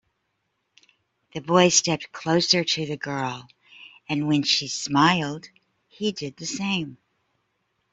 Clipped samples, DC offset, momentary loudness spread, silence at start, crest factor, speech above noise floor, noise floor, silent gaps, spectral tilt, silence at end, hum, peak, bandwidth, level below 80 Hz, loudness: under 0.1%; under 0.1%; 17 LU; 1.35 s; 24 dB; 52 dB; -75 dBFS; none; -3.5 dB/octave; 1 s; none; -2 dBFS; 8.2 kHz; -64 dBFS; -23 LUFS